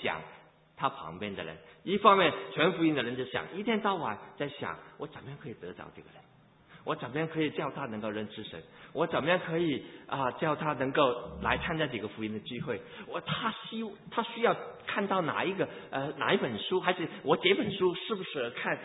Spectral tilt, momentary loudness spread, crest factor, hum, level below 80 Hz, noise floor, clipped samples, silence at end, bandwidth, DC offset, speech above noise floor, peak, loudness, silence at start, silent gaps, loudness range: -2 dB/octave; 16 LU; 26 dB; none; -62 dBFS; -58 dBFS; under 0.1%; 0 s; 3.9 kHz; under 0.1%; 26 dB; -6 dBFS; -31 LUFS; 0 s; none; 8 LU